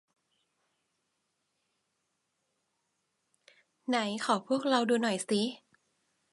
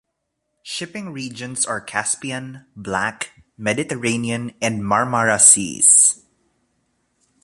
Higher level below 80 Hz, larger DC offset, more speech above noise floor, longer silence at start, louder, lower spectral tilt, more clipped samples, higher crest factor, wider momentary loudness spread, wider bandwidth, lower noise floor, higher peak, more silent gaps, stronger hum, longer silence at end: second, -86 dBFS vs -58 dBFS; neither; second, 51 dB vs 56 dB; first, 3.9 s vs 0.65 s; second, -30 LUFS vs -16 LUFS; first, -4 dB/octave vs -2 dB/octave; neither; about the same, 24 dB vs 20 dB; second, 6 LU vs 20 LU; second, 11.5 kHz vs 14.5 kHz; first, -81 dBFS vs -76 dBFS; second, -12 dBFS vs 0 dBFS; neither; neither; second, 0.75 s vs 1.3 s